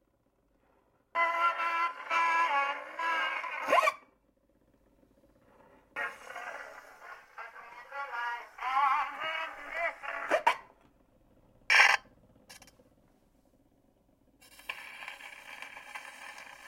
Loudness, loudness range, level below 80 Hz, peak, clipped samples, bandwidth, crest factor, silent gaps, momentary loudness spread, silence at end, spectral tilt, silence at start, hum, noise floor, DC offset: -30 LUFS; 17 LU; -74 dBFS; -6 dBFS; under 0.1%; 16.5 kHz; 30 dB; none; 19 LU; 0 s; 0 dB/octave; 1.15 s; none; -73 dBFS; under 0.1%